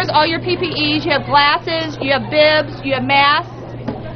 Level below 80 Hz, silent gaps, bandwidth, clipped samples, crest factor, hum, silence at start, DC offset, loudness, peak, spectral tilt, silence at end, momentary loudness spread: -42 dBFS; none; 6.6 kHz; under 0.1%; 16 dB; none; 0 s; under 0.1%; -15 LUFS; 0 dBFS; -6 dB/octave; 0 s; 10 LU